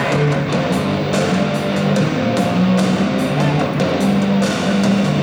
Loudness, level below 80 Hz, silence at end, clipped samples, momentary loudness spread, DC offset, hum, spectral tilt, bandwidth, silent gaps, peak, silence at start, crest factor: -17 LUFS; -46 dBFS; 0 s; under 0.1%; 3 LU; under 0.1%; none; -6 dB/octave; over 20 kHz; none; -6 dBFS; 0 s; 10 dB